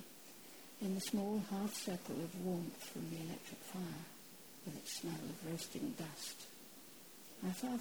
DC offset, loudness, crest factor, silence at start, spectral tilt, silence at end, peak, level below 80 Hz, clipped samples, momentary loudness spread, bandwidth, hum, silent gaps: under 0.1%; -45 LUFS; 18 dB; 0 s; -4.5 dB/octave; 0 s; -28 dBFS; -76 dBFS; under 0.1%; 15 LU; over 20 kHz; none; none